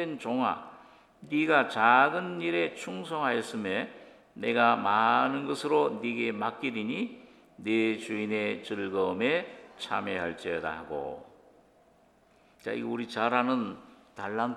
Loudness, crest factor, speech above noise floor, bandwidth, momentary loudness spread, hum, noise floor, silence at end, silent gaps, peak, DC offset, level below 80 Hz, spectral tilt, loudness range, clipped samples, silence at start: -29 LUFS; 22 dB; 34 dB; 12.5 kHz; 14 LU; none; -63 dBFS; 0 s; none; -8 dBFS; under 0.1%; -72 dBFS; -5 dB/octave; 7 LU; under 0.1%; 0 s